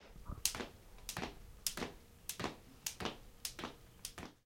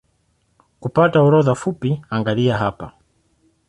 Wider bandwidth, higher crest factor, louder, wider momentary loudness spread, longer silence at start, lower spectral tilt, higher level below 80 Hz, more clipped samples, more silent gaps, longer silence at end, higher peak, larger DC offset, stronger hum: first, 16.5 kHz vs 11 kHz; first, 36 dB vs 16 dB; second, -44 LUFS vs -18 LUFS; second, 11 LU vs 15 LU; second, 0 s vs 0.8 s; second, -2 dB/octave vs -7.5 dB/octave; second, -58 dBFS vs -52 dBFS; neither; neither; second, 0.1 s vs 0.8 s; second, -10 dBFS vs -2 dBFS; neither; neither